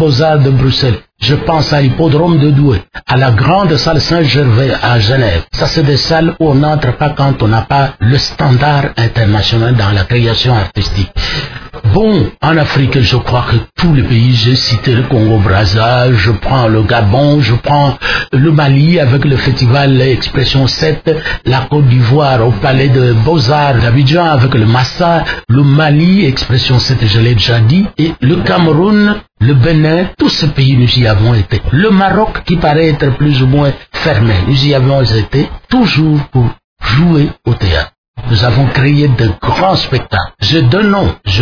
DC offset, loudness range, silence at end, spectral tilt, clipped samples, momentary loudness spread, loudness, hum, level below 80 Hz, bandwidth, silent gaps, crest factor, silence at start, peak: under 0.1%; 2 LU; 0 s; -7 dB/octave; under 0.1%; 5 LU; -10 LUFS; none; -26 dBFS; 5.4 kHz; 36.64-36.76 s, 37.98-38.14 s; 8 dB; 0 s; 0 dBFS